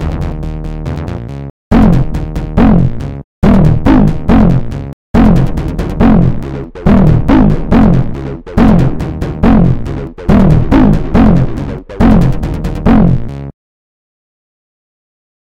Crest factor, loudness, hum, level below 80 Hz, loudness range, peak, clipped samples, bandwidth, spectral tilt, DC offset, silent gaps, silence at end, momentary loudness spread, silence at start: 10 dB; -10 LUFS; none; -16 dBFS; 4 LU; 0 dBFS; 1%; 8 kHz; -9.5 dB/octave; 0.9%; 1.50-1.71 s, 3.24-3.42 s, 4.93-5.14 s; 1.9 s; 13 LU; 0 s